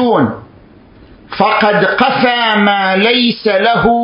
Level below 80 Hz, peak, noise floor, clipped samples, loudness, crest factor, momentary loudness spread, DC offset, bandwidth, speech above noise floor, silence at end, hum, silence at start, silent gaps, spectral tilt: -44 dBFS; 0 dBFS; -41 dBFS; under 0.1%; -11 LUFS; 12 dB; 5 LU; under 0.1%; 5.4 kHz; 29 dB; 0 s; none; 0 s; none; -8 dB/octave